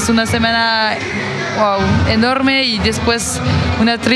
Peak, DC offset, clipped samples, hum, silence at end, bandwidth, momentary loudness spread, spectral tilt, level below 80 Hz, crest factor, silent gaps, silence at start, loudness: 0 dBFS; under 0.1%; under 0.1%; none; 0 s; 14 kHz; 5 LU; -4.5 dB/octave; -36 dBFS; 14 dB; none; 0 s; -14 LUFS